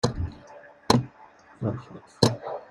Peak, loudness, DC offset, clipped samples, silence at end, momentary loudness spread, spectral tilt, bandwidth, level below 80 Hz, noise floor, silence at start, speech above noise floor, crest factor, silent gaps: -2 dBFS; -27 LUFS; under 0.1%; under 0.1%; 0.05 s; 22 LU; -5.5 dB/octave; 14.5 kHz; -48 dBFS; -52 dBFS; 0.05 s; 25 dB; 26 dB; none